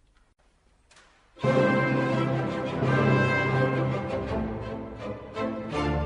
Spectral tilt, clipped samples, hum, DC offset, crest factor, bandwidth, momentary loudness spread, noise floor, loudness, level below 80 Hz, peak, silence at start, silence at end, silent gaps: -7.5 dB/octave; under 0.1%; none; under 0.1%; 16 dB; 9.8 kHz; 13 LU; -63 dBFS; -26 LUFS; -46 dBFS; -10 dBFS; 1.35 s; 0 s; none